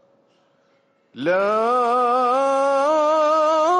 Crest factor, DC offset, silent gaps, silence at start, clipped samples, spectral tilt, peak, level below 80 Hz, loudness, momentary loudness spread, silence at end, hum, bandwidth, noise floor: 10 dB; under 0.1%; none; 1.15 s; under 0.1%; -4 dB/octave; -10 dBFS; -70 dBFS; -18 LUFS; 3 LU; 0 s; none; 10.5 kHz; -62 dBFS